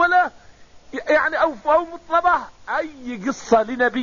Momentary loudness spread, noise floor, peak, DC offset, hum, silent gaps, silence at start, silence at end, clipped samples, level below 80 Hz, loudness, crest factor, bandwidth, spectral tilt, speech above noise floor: 10 LU; -47 dBFS; -6 dBFS; 0.3%; none; none; 0 s; 0 s; under 0.1%; -52 dBFS; -20 LUFS; 16 dB; 7.2 kHz; -2 dB/octave; 26 dB